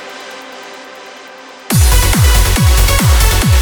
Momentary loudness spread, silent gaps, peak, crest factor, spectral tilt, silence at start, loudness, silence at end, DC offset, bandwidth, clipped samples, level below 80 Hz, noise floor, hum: 21 LU; none; 0 dBFS; 12 dB; -4 dB/octave; 0 s; -11 LUFS; 0 s; under 0.1%; over 20 kHz; under 0.1%; -14 dBFS; -33 dBFS; none